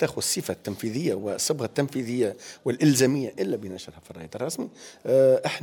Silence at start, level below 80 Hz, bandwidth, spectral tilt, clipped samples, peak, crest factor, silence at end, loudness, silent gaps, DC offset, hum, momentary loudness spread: 0 s; -64 dBFS; 19.5 kHz; -4.5 dB/octave; under 0.1%; -8 dBFS; 18 dB; 0 s; -25 LUFS; none; under 0.1%; none; 17 LU